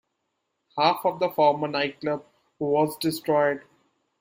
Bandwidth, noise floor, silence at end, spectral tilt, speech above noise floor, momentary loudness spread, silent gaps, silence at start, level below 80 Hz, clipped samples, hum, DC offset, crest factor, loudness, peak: 16 kHz; -78 dBFS; 0.6 s; -5 dB/octave; 54 dB; 11 LU; none; 0.75 s; -70 dBFS; under 0.1%; none; under 0.1%; 20 dB; -25 LUFS; -6 dBFS